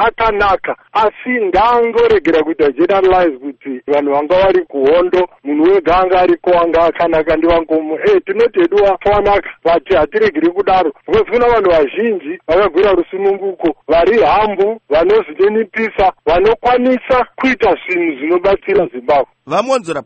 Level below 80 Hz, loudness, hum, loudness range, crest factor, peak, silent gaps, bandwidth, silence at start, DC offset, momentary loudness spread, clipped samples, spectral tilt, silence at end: -36 dBFS; -13 LUFS; none; 1 LU; 12 dB; 0 dBFS; none; 8.4 kHz; 0 s; under 0.1%; 6 LU; under 0.1%; -6 dB/octave; 0.05 s